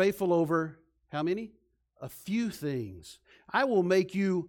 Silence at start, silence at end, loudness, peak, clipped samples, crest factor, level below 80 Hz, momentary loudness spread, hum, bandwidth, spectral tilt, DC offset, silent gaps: 0 s; 0 s; -30 LUFS; -14 dBFS; under 0.1%; 16 dB; -66 dBFS; 19 LU; none; 17.5 kHz; -6.5 dB/octave; under 0.1%; none